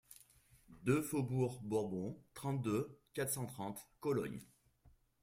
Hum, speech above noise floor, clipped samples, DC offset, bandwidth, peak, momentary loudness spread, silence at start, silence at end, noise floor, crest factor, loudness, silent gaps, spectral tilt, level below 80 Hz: none; 31 dB; under 0.1%; under 0.1%; 16 kHz; -22 dBFS; 10 LU; 0.1 s; 0.75 s; -70 dBFS; 20 dB; -40 LUFS; none; -6 dB/octave; -70 dBFS